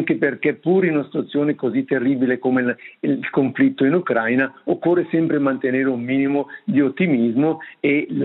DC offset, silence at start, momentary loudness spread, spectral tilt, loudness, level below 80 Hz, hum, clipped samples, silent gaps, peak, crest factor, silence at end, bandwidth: under 0.1%; 0 s; 5 LU; -11 dB/octave; -20 LUFS; -72 dBFS; none; under 0.1%; none; -6 dBFS; 14 dB; 0 s; 4.1 kHz